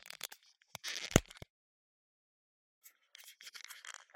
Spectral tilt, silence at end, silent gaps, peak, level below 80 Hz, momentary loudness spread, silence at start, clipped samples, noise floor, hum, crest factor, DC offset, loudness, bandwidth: -3.5 dB/octave; 0.25 s; 1.50-2.82 s; -4 dBFS; -54 dBFS; 25 LU; 0.05 s; under 0.1%; -60 dBFS; none; 38 dB; under 0.1%; -38 LUFS; 16.5 kHz